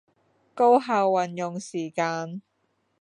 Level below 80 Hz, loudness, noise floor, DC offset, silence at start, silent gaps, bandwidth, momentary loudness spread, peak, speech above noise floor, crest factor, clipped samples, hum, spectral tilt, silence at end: -82 dBFS; -24 LUFS; -72 dBFS; under 0.1%; 0.55 s; none; 10.5 kHz; 13 LU; -8 dBFS; 48 dB; 18 dB; under 0.1%; none; -5.5 dB/octave; 0.6 s